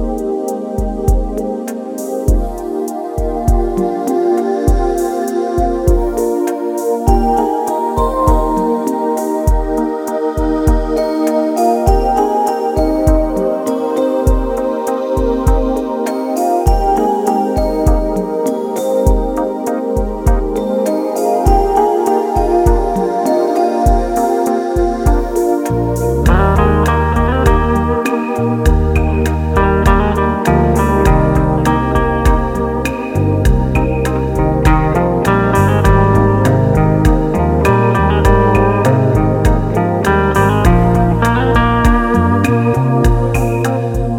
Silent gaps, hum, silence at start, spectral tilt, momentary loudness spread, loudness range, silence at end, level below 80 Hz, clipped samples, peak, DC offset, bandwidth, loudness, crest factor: none; none; 0 s; -7.5 dB/octave; 6 LU; 4 LU; 0 s; -18 dBFS; under 0.1%; 0 dBFS; under 0.1%; 17 kHz; -14 LUFS; 12 dB